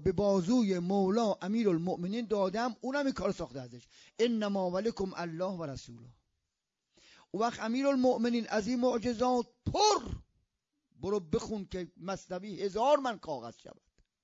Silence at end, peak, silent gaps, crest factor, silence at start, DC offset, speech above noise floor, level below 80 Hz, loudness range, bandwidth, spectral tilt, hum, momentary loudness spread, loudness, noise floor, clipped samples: 0.55 s; -14 dBFS; none; 18 dB; 0 s; under 0.1%; 55 dB; -58 dBFS; 5 LU; 7.4 kHz; -5 dB/octave; none; 14 LU; -32 LUFS; -87 dBFS; under 0.1%